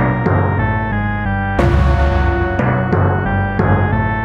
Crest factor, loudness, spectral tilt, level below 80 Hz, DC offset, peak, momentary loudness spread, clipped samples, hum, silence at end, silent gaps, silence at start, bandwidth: 12 dB; -16 LUFS; -9 dB/octave; -22 dBFS; under 0.1%; -2 dBFS; 4 LU; under 0.1%; none; 0 s; none; 0 s; 6.6 kHz